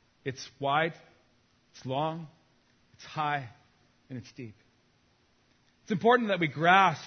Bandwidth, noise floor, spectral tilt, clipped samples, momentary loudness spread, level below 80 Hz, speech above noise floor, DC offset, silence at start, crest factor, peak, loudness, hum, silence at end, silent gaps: 6.6 kHz; -68 dBFS; -5.5 dB/octave; under 0.1%; 24 LU; -74 dBFS; 39 dB; under 0.1%; 0.25 s; 24 dB; -6 dBFS; -28 LUFS; none; 0 s; none